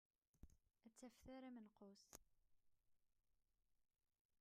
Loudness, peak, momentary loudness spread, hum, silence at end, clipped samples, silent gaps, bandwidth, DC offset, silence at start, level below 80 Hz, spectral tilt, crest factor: -64 LUFS; -36 dBFS; 8 LU; none; 0 s; under 0.1%; 4.21-4.29 s; 13.5 kHz; under 0.1%; 0.35 s; -80 dBFS; -4.5 dB/octave; 32 dB